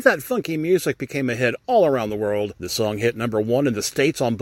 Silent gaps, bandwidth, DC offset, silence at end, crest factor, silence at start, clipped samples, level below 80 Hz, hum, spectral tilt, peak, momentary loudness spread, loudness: none; 17 kHz; under 0.1%; 0 s; 18 dB; 0 s; under 0.1%; -56 dBFS; none; -5 dB/octave; -2 dBFS; 6 LU; -22 LUFS